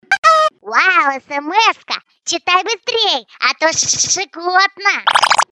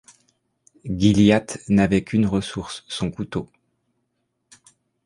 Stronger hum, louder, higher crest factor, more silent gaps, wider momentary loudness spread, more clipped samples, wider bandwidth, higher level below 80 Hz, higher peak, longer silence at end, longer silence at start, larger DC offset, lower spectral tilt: neither; first, -14 LUFS vs -21 LUFS; second, 14 dB vs 20 dB; first, 0.18-0.22 s vs none; second, 8 LU vs 15 LU; neither; first, 12.5 kHz vs 11 kHz; second, -62 dBFS vs -46 dBFS; about the same, 0 dBFS vs -2 dBFS; second, 0.1 s vs 1.6 s; second, 0.1 s vs 0.85 s; neither; second, 0.5 dB/octave vs -6 dB/octave